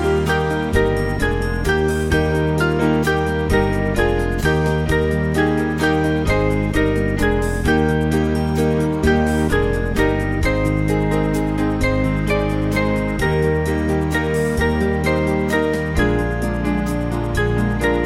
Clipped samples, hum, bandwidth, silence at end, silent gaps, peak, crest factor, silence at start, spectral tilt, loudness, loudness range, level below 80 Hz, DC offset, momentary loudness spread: under 0.1%; none; 16 kHz; 0 s; none; -2 dBFS; 14 dB; 0 s; -6.5 dB/octave; -19 LUFS; 1 LU; -26 dBFS; under 0.1%; 3 LU